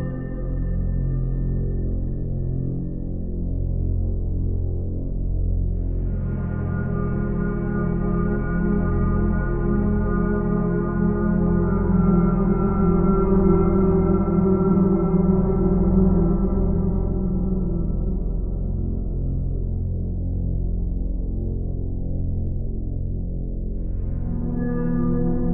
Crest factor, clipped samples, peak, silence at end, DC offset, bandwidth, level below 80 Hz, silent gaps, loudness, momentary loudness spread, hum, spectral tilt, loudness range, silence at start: 16 dB; under 0.1%; -4 dBFS; 0 s; under 0.1%; 2.4 kHz; -26 dBFS; none; -23 LUFS; 10 LU; none; -13 dB/octave; 8 LU; 0 s